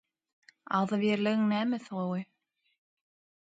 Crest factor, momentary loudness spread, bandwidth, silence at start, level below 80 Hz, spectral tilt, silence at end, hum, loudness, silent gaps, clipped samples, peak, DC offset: 18 dB; 8 LU; 7.8 kHz; 0.7 s; -78 dBFS; -7 dB/octave; 1.2 s; none; -30 LUFS; none; under 0.1%; -14 dBFS; under 0.1%